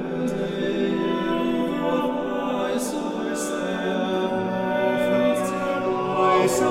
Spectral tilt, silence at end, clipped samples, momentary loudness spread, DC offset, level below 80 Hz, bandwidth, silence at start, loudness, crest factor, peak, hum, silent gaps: -5 dB/octave; 0 s; under 0.1%; 6 LU; under 0.1%; -54 dBFS; 16 kHz; 0 s; -24 LUFS; 16 dB; -8 dBFS; none; none